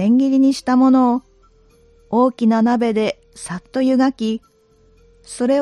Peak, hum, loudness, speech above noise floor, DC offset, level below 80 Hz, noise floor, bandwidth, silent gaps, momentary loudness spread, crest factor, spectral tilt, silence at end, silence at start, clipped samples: -4 dBFS; none; -17 LUFS; 37 dB; under 0.1%; -56 dBFS; -53 dBFS; 11 kHz; none; 15 LU; 14 dB; -6 dB/octave; 0 s; 0 s; under 0.1%